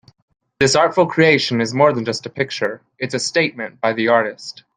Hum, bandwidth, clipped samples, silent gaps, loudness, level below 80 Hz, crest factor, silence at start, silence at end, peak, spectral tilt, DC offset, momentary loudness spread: none; 10 kHz; under 0.1%; none; -17 LUFS; -58 dBFS; 16 dB; 0.6 s; 0.25 s; -2 dBFS; -4 dB/octave; under 0.1%; 11 LU